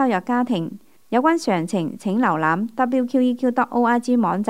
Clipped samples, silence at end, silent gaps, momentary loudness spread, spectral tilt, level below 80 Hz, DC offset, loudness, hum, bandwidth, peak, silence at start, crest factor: under 0.1%; 0 s; none; 5 LU; -6.5 dB/octave; -70 dBFS; 0.3%; -20 LUFS; none; 12 kHz; -4 dBFS; 0 s; 16 dB